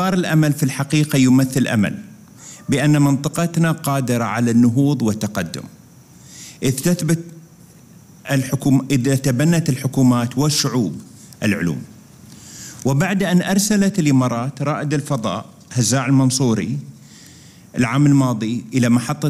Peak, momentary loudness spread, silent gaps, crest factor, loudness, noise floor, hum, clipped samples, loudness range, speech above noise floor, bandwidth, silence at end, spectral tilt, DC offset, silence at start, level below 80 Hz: -4 dBFS; 13 LU; none; 14 dB; -18 LUFS; -45 dBFS; none; under 0.1%; 3 LU; 28 dB; 16 kHz; 0 s; -5.5 dB/octave; under 0.1%; 0 s; -52 dBFS